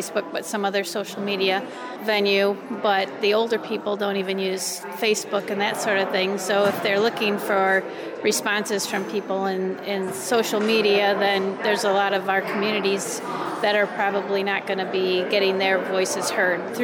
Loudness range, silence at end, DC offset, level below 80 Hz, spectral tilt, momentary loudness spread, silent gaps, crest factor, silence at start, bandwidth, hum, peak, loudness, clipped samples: 2 LU; 0 s; under 0.1%; -78 dBFS; -3 dB/octave; 7 LU; none; 14 dB; 0 s; over 20 kHz; none; -8 dBFS; -23 LUFS; under 0.1%